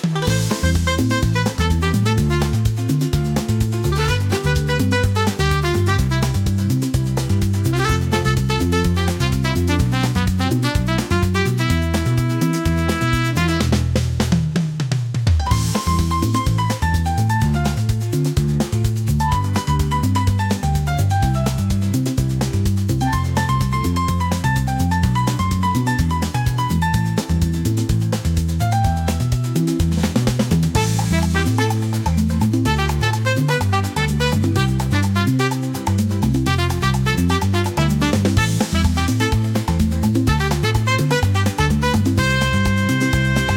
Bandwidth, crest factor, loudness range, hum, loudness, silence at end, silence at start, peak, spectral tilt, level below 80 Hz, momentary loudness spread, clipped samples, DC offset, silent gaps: 17 kHz; 14 dB; 1 LU; none; -19 LUFS; 0 s; 0 s; -4 dBFS; -5.5 dB/octave; -30 dBFS; 2 LU; under 0.1%; under 0.1%; none